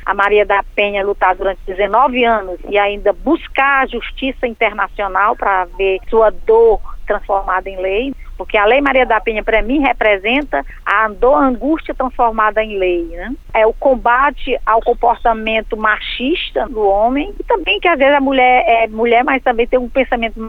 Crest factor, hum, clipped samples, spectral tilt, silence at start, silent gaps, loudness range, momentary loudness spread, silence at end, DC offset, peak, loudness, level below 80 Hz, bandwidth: 14 dB; none; under 0.1%; -6 dB/octave; 0 s; none; 2 LU; 8 LU; 0 s; under 0.1%; 0 dBFS; -14 LUFS; -30 dBFS; 5.4 kHz